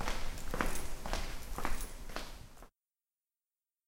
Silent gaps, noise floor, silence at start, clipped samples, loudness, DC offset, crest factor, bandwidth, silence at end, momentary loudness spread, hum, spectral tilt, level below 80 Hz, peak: none; under -90 dBFS; 0 s; under 0.1%; -42 LUFS; under 0.1%; 24 dB; 16.5 kHz; 1.2 s; 17 LU; none; -3.5 dB/octave; -42 dBFS; -14 dBFS